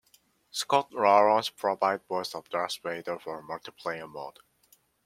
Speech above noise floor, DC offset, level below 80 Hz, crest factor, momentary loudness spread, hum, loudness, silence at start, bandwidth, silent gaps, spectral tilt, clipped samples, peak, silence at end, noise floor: 37 dB; under 0.1%; -76 dBFS; 22 dB; 17 LU; none; -28 LUFS; 0.55 s; 16.5 kHz; none; -3 dB/octave; under 0.1%; -6 dBFS; 0.75 s; -65 dBFS